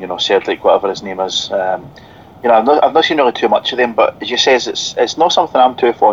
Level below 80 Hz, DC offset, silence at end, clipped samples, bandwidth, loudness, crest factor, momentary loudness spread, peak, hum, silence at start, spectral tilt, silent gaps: -54 dBFS; 0.1%; 0 s; under 0.1%; 7.8 kHz; -13 LUFS; 14 dB; 7 LU; 0 dBFS; none; 0 s; -2.5 dB/octave; none